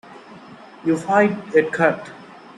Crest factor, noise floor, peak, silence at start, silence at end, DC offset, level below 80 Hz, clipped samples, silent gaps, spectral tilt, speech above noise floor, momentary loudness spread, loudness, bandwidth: 18 dB; -42 dBFS; -2 dBFS; 0.1 s; 0.3 s; under 0.1%; -66 dBFS; under 0.1%; none; -6.5 dB/octave; 23 dB; 12 LU; -19 LUFS; 11.5 kHz